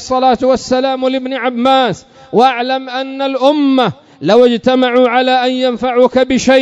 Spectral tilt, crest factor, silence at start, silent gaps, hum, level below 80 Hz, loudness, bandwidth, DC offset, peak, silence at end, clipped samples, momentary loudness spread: -4.5 dB/octave; 12 dB; 0 s; none; none; -48 dBFS; -12 LUFS; 8 kHz; under 0.1%; 0 dBFS; 0 s; 0.4%; 7 LU